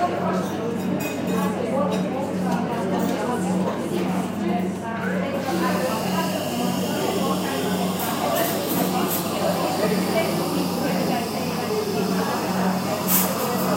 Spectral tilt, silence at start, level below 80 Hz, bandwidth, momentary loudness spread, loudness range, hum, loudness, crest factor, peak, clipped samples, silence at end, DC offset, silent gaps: -5 dB/octave; 0 s; -58 dBFS; 16 kHz; 3 LU; 2 LU; none; -23 LUFS; 18 dB; -6 dBFS; under 0.1%; 0 s; under 0.1%; none